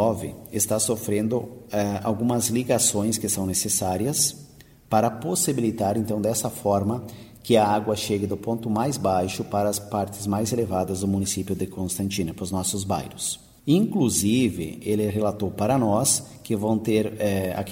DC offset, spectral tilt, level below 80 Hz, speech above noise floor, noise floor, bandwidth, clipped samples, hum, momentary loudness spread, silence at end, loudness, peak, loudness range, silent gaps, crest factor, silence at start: under 0.1%; -4.5 dB/octave; -54 dBFS; 23 dB; -47 dBFS; 16.5 kHz; under 0.1%; none; 8 LU; 0 s; -24 LUFS; -6 dBFS; 3 LU; none; 18 dB; 0 s